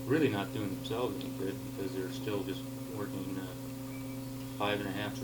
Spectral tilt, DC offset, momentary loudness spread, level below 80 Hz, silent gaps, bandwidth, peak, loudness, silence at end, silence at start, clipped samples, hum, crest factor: -5.5 dB/octave; under 0.1%; 9 LU; -60 dBFS; none; 19 kHz; -16 dBFS; -37 LUFS; 0 s; 0 s; under 0.1%; 60 Hz at -70 dBFS; 20 dB